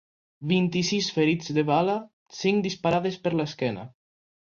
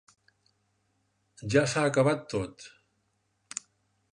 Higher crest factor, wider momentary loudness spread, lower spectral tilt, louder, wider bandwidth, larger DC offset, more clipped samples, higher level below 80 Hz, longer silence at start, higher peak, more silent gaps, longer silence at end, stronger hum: second, 16 dB vs 22 dB; second, 10 LU vs 19 LU; about the same, -5.5 dB/octave vs -5 dB/octave; first, -25 LUFS vs -28 LUFS; second, 7.4 kHz vs 11.5 kHz; neither; neither; about the same, -62 dBFS vs -62 dBFS; second, 0.4 s vs 1.4 s; about the same, -10 dBFS vs -10 dBFS; first, 2.13-2.26 s vs none; second, 0.55 s vs 1.45 s; neither